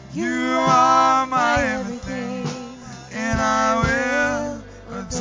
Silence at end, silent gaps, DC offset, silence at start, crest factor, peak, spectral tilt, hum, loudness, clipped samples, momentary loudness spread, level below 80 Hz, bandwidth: 0 s; none; under 0.1%; 0 s; 16 dB; -4 dBFS; -4.5 dB/octave; none; -20 LUFS; under 0.1%; 19 LU; -40 dBFS; 7.6 kHz